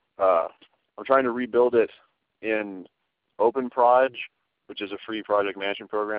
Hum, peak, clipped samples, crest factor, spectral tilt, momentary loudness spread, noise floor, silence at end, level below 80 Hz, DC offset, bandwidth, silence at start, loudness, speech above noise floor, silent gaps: none; -6 dBFS; under 0.1%; 18 dB; -2 dB/octave; 16 LU; -57 dBFS; 0 s; -70 dBFS; under 0.1%; 5 kHz; 0.2 s; -24 LUFS; 33 dB; none